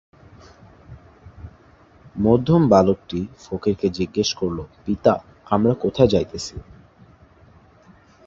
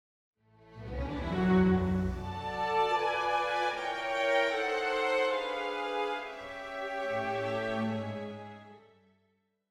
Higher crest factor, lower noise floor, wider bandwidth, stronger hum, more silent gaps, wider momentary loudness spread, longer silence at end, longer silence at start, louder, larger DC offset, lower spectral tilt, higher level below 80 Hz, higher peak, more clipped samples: about the same, 22 dB vs 18 dB; second, -51 dBFS vs -75 dBFS; second, 8 kHz vs 12 kHz; neither; neither; about the same, 15 LU vs 13 LU; first, 1.65 s vs 0.9 s; first, 0.9 s vs 0.65 s; first, -20 LUFS vs -31 LUFS; neither; about the same, -6.5 dB/octave vs -6 dB/octave; first, -44 dBFS vs -50 dBFS; first, 0 dBFS vs -16 dBFS; neither